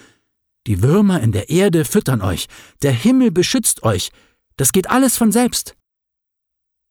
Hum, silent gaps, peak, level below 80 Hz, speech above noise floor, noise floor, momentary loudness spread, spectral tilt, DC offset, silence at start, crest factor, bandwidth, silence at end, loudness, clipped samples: none; none; 0 dBFS; -44 dBFS; 64 dB; -79 dBFS; 10 LU; -5 dB/octave; under 0.1%; 0.65 s; 16 dB; 19 kHz; 1.2 s; -16 LUFS; under 0.1%